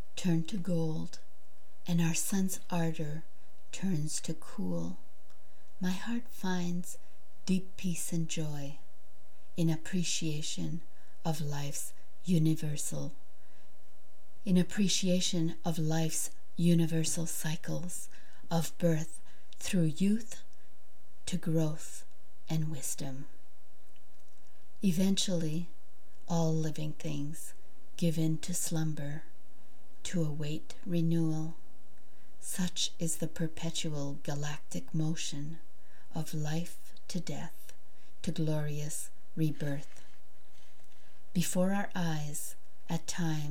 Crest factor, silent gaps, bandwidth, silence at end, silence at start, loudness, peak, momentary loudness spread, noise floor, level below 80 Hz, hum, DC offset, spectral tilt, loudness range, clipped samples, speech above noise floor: 18 dB; none; 17 kHz; 0 s; 0.15 s; -34 LUFS; -16 dBFS; 15 LU; -66 dBFS; -68 dBFS; none; 3%; -5 dB/octave; 6 LU; under 0.1%; 33 dB